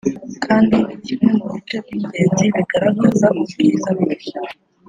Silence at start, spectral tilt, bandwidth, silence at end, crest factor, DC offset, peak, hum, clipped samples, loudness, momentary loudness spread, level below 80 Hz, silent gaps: 0.05 s; -6 dB/octave; 9.4 kHz; 0.35 s; 16 dB; under 0.1%; -2 dBFS; none; under 0.1%; -17 LUFS; 12 LU; -52 dBFS; none